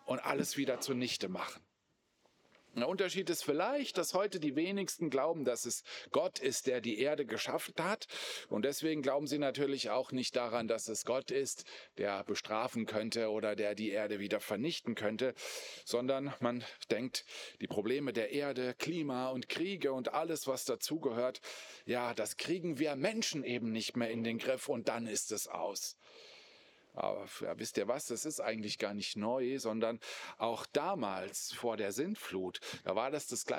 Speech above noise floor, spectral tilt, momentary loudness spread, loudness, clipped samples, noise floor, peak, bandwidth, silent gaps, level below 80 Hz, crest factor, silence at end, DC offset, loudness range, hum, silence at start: 42 dB; -3.5 dB/octave; 6 LU; -37 LUFS; under 0.1%; -79 dBFS; -18 dBFS; over 20 kHz; none; -90 dBFS; 20 dB; 0 s; under 0.1%; 3 LU; none; 0.05 s